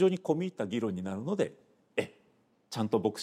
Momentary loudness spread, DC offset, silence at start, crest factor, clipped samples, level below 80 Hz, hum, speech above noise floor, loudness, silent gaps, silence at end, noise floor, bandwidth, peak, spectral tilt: 7 LU; under 0.1%; 0 s; 18 dB; under 0.1%; -76 dBFS; none; 38 dB; -33 LUFS; none; 0 s; -69 dBFS; 15 kHz; -14 dBFS; -6.5 dB/octave